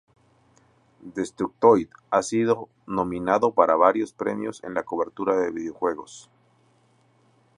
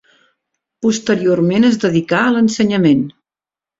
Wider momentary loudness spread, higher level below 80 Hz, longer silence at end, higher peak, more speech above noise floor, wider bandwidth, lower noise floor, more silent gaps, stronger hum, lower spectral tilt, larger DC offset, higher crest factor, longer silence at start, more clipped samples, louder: first, 13 LU vs 5 LU; second, -62 dBFS vs -54 dBFS; first, 1.35 s vs 0.7 s; about the same, -2 dBFS vs -2 dBFS; second, 39 dB vs over 77 dB; first, 11 kHz vs 7.8 kHz; second, -62 dBFS vs under -90 dBFS; neither; neither; about the same, -6 dB/octave vs -5.5 dB/octave; neither; first, 22 dB vs 14 dB; first, 1.05 s vs 0.8 s; neither; second, -24 LUFS vs -14 LUFS